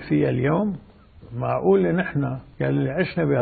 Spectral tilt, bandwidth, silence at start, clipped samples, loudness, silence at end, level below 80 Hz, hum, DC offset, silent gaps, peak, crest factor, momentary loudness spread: -12.5 dB/octave; 4.7 kHz; 0 s; under 0.1%; -23 LUFS; 0 s; -50 dBFS; none; under 0.1%; none; -6 dBFS; 16 dB; 10 LU